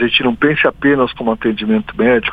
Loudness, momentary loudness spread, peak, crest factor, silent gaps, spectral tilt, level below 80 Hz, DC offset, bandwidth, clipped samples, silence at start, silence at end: -14 LUFS; 5 LU; 0 dBFS; 14 dB; none; -7.5 dB/octave; -42 dBFS; under 0.1%; 5 kHz; under 0.1%; 0 s; 0 s